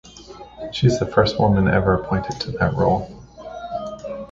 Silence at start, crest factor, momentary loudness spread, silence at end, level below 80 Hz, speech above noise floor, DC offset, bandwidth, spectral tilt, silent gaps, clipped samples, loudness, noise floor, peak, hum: 0.05 s; 18 dB; 20 LU; 0.05 s; -38 dBFS; 22 dB; under 0.1%; 8 kHz; -6.5 dB/octave; none; under 0.1%; -20 LUFS; -41 dBFS; -2 dBFS; none